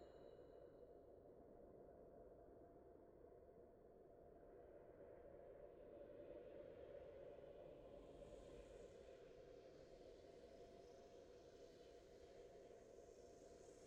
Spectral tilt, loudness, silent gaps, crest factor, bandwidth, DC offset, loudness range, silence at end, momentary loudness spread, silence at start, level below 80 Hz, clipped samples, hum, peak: -6 dB/octave; -64 LUFS; none; 16 dB; 9.4 kHz; under 0.1%; 5 LU; 0 s; 6 LU; 0 s; -76 dBFS; under 0.1%; none; -48 dBFS